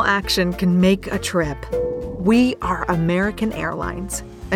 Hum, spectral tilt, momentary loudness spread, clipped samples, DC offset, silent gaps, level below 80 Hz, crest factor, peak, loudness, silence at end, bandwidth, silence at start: none; -5.5 dB/octave; 9 LU; under 0.1%; under 0.1%; none; -36 dBFS; 14 dB; -4 dBFS; -20 LUFS; 0 s; 16 kHz; 0 s